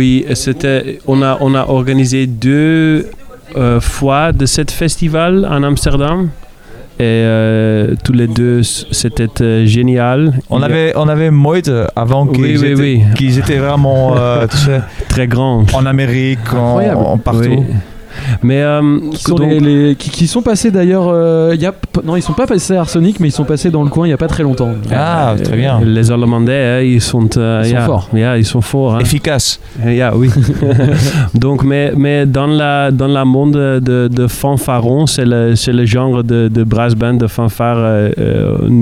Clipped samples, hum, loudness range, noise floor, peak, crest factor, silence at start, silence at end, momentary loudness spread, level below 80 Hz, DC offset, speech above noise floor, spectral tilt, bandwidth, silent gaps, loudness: under 0.1%; none; 2 LU; -32 dBFS; 0 dBFS; 10 dB; 0 s; 0 s; 4 LU; -28 dBFS; 0.2%; 22 dB; -6.5 dB/octave; 15 kHz; none; -11 LUFS